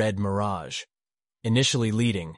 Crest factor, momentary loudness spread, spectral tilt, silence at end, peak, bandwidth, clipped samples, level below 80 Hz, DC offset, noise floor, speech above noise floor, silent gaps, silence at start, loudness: 14 dB; 13 LU; -5 dB/octave; 0 s; -12 dBFS; 11.5 kHz; under 0.1%; -56 dBFS; under 0.1%; under -90 dBFS; over 65 dB; none; 0 s; -26 LUFS